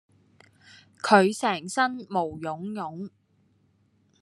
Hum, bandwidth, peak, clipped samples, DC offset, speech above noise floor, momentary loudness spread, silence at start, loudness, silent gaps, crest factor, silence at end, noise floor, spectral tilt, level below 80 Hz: none; 12.5 kHz; -2 dBFS; under 0.1%; under 0.1%; 40 dB; 16 LU; 1.05 s; -25 LUFS; none; 26 dB; 1.15 s; -66 dBFS; -4.5 dB/octave; -72 dBFS